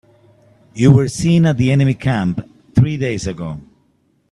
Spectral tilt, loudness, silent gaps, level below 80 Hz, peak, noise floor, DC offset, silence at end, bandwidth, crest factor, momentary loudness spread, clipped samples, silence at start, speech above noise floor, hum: -7 dB/octave; -15 LUFS; none; -42 dBFS; 0 dBFS; -60 dBFS; under 0.1%; 0.7 s; 11.5 kHz; 16 dB; 15 LU; under 0.1%; 0.75 s; 45 dB; none